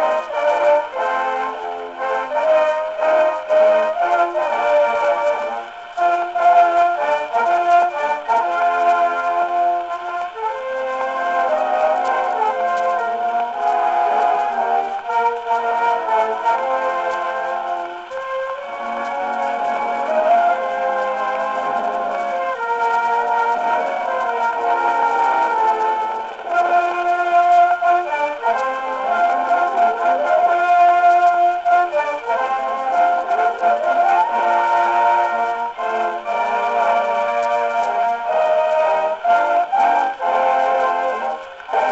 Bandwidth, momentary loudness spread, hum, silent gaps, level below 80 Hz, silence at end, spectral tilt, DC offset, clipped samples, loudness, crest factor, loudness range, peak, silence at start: 8 kHz; 8 LU; none; none; -62 dBFS; 0 s; -3 dB/octave; under 0.1%; under 0.1%; -18 LUFS; 14 dB; 4 LU; -4 dBFS; 0 s